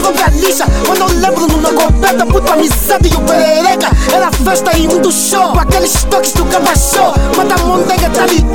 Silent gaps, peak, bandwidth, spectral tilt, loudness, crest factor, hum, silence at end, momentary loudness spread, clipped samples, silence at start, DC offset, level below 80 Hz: none; 0 dBFS; 17.5 kHz; -4 dB/octave; -10 LUFS; 10 dB; none; 0 s; 2 LU; under 0.1%; 0 s; 5%; -16 dBFS